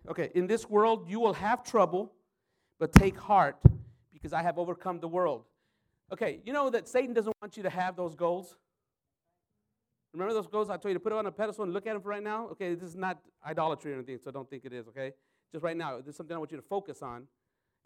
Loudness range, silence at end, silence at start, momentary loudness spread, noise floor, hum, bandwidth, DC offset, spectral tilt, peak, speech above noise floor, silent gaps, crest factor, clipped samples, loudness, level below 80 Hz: 11 LU; 0.6 s; 0.05 s; 18 LU; -88 dBFS; none; 17.5 kHz; under 0.1%; -7 dB/octave; -2 dBFS; 57 dB; none; 30 dB; under 0.1%; -30 LUFS; -44 dBFS